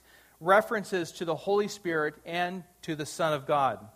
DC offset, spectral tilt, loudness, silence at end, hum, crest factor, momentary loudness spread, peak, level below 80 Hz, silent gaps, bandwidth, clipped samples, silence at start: under 0.1%; -4.5 dB/octave; -29 LUFS; 0.05 s; none; 20 dB; 11 LU; -8 dBFS; -68 dBFS; none; 15.5 kHz; under 0.1%; 0.4 s